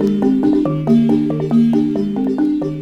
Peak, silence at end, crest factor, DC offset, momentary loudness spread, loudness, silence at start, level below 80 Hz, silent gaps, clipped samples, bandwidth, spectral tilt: -2 dBFS; 0 s; 12 dB; under 0.1%; 5 LU; -15 LUFS; 0 s; -46 dBFS; none; under 0.1%; 6.6 kHz; -9.5 dB/octave